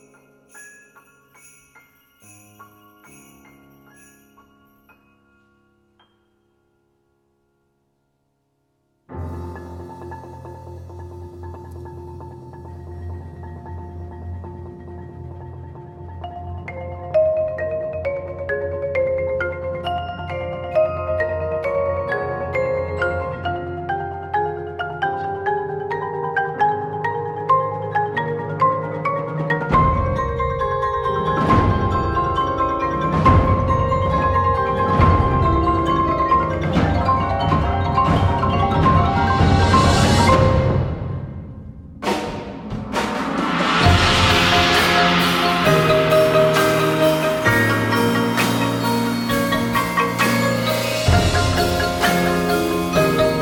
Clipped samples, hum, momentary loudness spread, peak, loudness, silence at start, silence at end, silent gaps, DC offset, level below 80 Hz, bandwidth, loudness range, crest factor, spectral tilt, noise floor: under 0.1%; none; 21 LU; -2 dBFS; -18 LUFS; 0.55 s; 0 s; none; under 0.1%; -32 dBFS; 18 kHz; 19 LU; 18 dB; -5.5 dB/octave; -69 dBFS